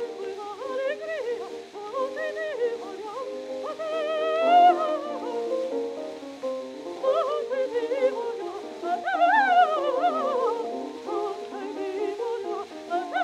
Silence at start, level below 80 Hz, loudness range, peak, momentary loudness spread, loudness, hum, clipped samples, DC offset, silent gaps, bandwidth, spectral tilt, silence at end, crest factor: 0 s; -78 dBFS; 7 LU; -8 dBFS; 15 LU; -27 LUFS; none; under 0.1%; under 0.1%; none; 11 kHz; -3 dB/octave; 0 s; 18 dB